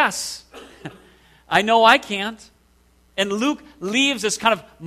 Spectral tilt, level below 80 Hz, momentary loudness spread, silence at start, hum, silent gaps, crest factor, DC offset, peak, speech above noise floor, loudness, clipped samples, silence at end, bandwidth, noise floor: -2.5 dB/octave; -58 dBFS; 23 LU; 0 s; none; none; 22 dB; under 0.1%; 0 dBFS; 38 dB; -19 LUFS; under 0.1%; 0 s; 14 kHz; -57 dBFS